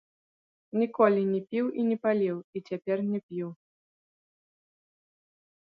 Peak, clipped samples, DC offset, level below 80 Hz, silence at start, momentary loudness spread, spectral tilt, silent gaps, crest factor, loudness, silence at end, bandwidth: -10 dBFS; under 0.1%; under 0.1%; -80 dBFS; 0.75 s; 13 LU; -10 dB/octave; 2.44-2.53 s, 3.23-3.29 s; 22 dB; -29 LUFS; 2.1 s; 5.8 kHz